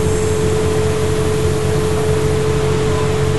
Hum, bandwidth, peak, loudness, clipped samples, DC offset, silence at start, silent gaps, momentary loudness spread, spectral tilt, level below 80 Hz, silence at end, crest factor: none; 12 kHz; -4 dBFS; -16 LUFS; under 0.1%; 6%; 0 s; none; 1 LU; -6 dB/octave; -30 dBFS; 0 s; 12 dB